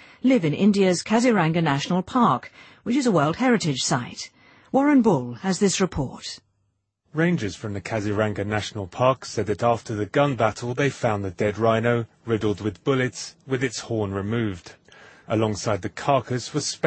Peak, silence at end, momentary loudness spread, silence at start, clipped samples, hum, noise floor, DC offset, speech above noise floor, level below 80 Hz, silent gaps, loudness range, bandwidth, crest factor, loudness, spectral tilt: -4 dBFS; 0 s; 10 LU; 0.25 s; under 0.1%; none; -72 dBFS; under 0.1%; 50 dB; -54 dBFS; none; 5 LU; 8.8 kHz; 18 dB; -23 LUFS; -5.5 dB/octave